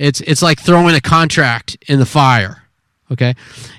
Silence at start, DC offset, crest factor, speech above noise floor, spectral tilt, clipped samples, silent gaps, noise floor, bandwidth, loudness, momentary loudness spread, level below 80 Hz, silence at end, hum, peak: 0 s; under 0.1%; 12 dB; 44 dB; -5 dB/octave; 0.1%; none; -56 dBFS; 14.5 kHz; -12 LUFS; 11 LU; -42 dBFS; 0.1 s; none; 0 dBFS